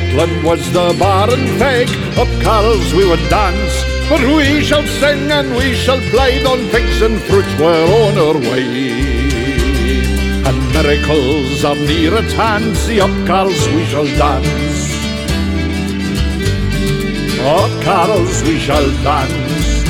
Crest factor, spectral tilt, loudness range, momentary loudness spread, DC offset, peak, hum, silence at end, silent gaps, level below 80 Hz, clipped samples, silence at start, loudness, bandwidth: 12 dB; -5.5 dB/octave; 3 LU; 5 LU; under 0.1%; 0 dBFS; none; 0 s; none; -20 dBFS; under 0.1%; 0 s; -13 LUFS; 17 kHz